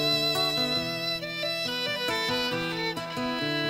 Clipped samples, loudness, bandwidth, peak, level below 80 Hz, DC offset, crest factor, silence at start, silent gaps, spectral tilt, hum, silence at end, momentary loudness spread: under 0.1%; -27 LUFS; 16 kHz; -16 dBFS; -58 dBFS; under 0.1%; 14 dB; 0 s; none; -3.5 dB/octave; none; 0 s; 6 LU